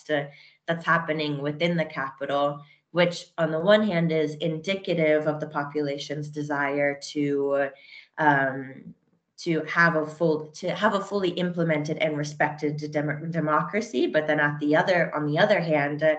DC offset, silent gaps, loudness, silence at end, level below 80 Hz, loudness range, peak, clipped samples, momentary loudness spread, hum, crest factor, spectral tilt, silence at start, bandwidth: under 0.1%; none; -25 LUFS; 0 s; -72 dBFS; 2 LU; -6 dBFS; under 0.1%; 9 LU; none; 20 dB; -6 dB/octave; 0.1 s; 8.6 kHz